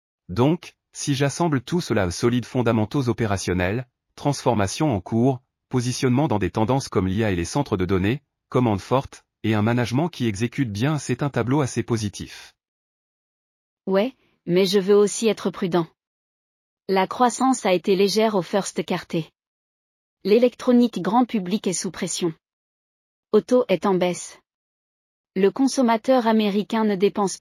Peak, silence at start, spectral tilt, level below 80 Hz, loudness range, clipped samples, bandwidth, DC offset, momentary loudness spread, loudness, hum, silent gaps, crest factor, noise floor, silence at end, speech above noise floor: -6 dBFS; 0.3 s; -5.5 dB/octave; -54 dBFS; 3 LU; under 0.1%; 14.5 kHz; under 0.1%; 10 LU; -22 LUFS; none; 12.68-13.77 s, 16.07-16.77 s, 19.47-20.17 s, 22.53-23.23 s, 24.54-25.24 s; 18 dB; under -90 dBFS; 0.05 s; over 69 dB